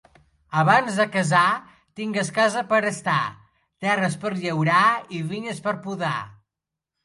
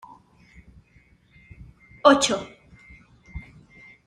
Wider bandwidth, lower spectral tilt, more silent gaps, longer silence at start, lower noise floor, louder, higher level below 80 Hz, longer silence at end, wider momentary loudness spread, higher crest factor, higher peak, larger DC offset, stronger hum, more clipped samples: about the same, 11.5 kHz vs 12 kHz; first, -5 dB/octave vs -3 dB/octave; neither; second, 0.5 s vs 2.05 s; first, -86 dBFS vs -58 dBFS; about the same, -22 LUFS vs -20 LUFS; second, -66 dBFS vs -52 dBFS; about the same, 0.7 s vs 0.65 s; second, 11 LU vs 26 LU; second, 20 dB vs 26 dB; about the same, -4 dBFS vs -2 dBFS; neither; neither; neither